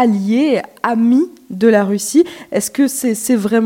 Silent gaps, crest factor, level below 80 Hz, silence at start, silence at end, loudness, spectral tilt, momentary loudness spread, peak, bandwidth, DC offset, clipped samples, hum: none; 14 dB; -62 dBFS; 0 s; 0 s; -15 LUFS; -5 dB/octave; 6 LU; 0 dBFS; 17 kHz; under 0.1%; under 0.1%; none